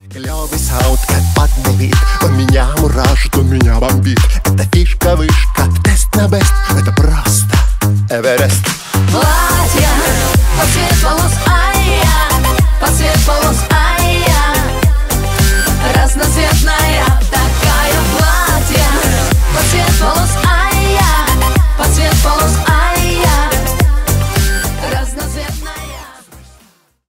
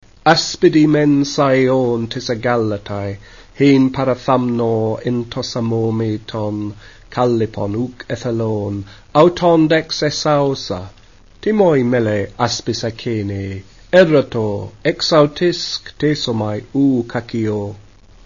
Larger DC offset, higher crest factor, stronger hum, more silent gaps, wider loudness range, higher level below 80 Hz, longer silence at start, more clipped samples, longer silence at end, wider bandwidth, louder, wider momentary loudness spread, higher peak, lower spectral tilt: second, under 0.1% vs 0.3%; second, 10 dB vs 16 dB; neither; neither; second, 1 LU vs 4 LU; first, -14 dBFS vs -46 dBFS; second, 0.05 s vs 0.25 s; neither; first, 0.7 s vs 0.45 s; first, 16.5 kHz vs 7.4 kHz; first, -11 LUFS vs -16 LUFS; second, 3 LU vs 12 LU; about the same, 0 dBFS vs 0 dBFS; second, -4.5 dB/octave vs -6 dB/octave